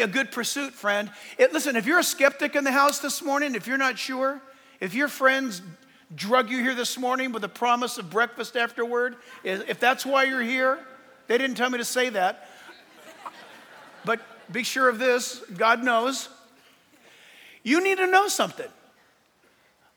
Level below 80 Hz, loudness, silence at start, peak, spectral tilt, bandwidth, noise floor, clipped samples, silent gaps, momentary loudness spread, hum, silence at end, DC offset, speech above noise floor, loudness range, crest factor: -84 dBFS; -24 LUFS; 0 s; -4 dBFS; -2.5 dB/octave; over 20 kHz; -62 dBFS; under 0.1%; none; 14 LU; none; 1.3 s; under 0.1%; 38 dB; 5 LU; 22 dB